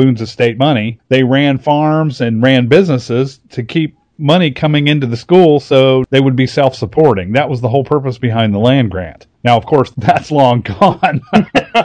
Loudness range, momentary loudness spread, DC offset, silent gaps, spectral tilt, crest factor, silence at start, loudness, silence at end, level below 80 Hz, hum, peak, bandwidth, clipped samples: 2 LU; 7 LU; under 0.1%; none; -7.5 dB/octave; 12 dB; 0 s; -12 LUFS; 0 s; -44 dBFS; none; 0 dBFS; 9.4 kHz; 0.6%